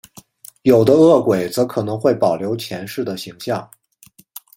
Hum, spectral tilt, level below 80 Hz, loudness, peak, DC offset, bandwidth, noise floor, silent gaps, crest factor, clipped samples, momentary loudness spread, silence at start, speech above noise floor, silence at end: none; -6.5 dB/octave; -56 dBFS; -17 LUFS; 0 dBFS; under 0.1%; 17 kHz; -50 dBFS; none; 18 dB; under 0.1%; 15 LU; 0.65 s; 34 dB; 0.95 s